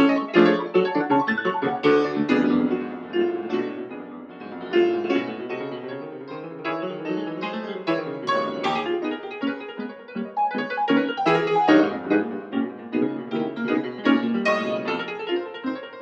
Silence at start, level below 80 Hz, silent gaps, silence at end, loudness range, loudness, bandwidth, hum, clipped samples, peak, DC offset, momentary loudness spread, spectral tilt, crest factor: 0 s; -70 dBFS; none; 0 s; 5 LU; -24 LUFS; 7.4 kHz; none; under 0.1%; -2 dBFS; under 0.1%; 14 LU; -6.5 dB/octave; 22 dB